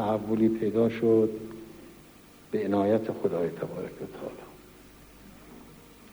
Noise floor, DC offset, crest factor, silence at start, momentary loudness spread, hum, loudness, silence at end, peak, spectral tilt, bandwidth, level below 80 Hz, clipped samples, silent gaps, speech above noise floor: -53 dBFS; under 0.1%; 16 dB; 0 s; 25 LU; none; -28 LUFS; 0.05 s; -12 dBFS; -8 dB/octave; over 20 kHz; -60 dBFS; under 0.1%; none; 26 dB